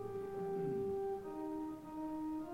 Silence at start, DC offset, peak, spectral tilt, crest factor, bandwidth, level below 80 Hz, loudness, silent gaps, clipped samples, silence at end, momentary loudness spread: 0 s; under 0.1%; -30 dBFS; -8.5 dB/octave; 12 dB; 16 kHz; -66 dBFS; -42 LUFS; none; under 0.1%; 0 s; 6 LU